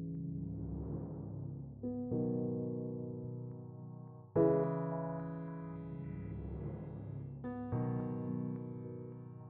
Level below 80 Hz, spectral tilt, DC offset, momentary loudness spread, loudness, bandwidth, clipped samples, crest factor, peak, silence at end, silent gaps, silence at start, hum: -58 dBFS; -12 dB/octave; under 0.1%; 11 LU; -40 LUFS; 2.9 kHz; under 0.1%; 20 dB; -20 dBFS; 0 s; none; 0 s; none